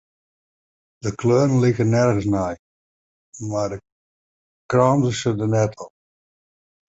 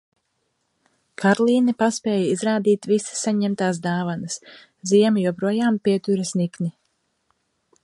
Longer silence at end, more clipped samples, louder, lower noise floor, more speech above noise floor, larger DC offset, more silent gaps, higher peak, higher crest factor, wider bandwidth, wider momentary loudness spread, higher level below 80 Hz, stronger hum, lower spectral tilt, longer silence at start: about the same, 1.05 s vs 1.15 s; neither; about the same, -20 LUFS vs -21 LUFS; first, under -90 dBFS vs -72 dBFS; first, over 71 dB vs 52 dB; neither; first, 2.59-3.32 s, 3.92-4.69 s vs none; about the same, -2 dBFS vs -4 dBFS; about the same, 20 dB vs 18 dB; second, 8 kHz vs 11.5 kHz; first, 17 LU vs 10 LU; first, -50 dBFS vs -68 dBFS; neither; first, -7 dB/octave vs -5.5 dB/octave; second, 1.05 s vs 1.2 s